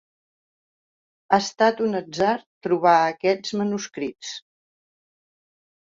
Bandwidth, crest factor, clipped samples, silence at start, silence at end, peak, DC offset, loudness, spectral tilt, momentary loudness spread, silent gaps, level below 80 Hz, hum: 7.8 kHz; 20 dB; under 0.1%; 1.3 s; 1.55 s; -6 dBFS; under 0.1%; -22 LUFS; -4.5 dB/octave; 13 LU; 2.46-2.61 s; -66 dBFS; none